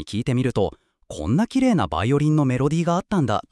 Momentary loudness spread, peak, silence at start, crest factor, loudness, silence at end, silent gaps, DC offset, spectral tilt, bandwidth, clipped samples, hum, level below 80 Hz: 6 LU; -8 dBFS; 0 s; 14 dB; -21 LUFS; 0.1 s; none; under 0.1%; -7 dB/octave; 12 kHz; under 0.1%; none; -46 dBFS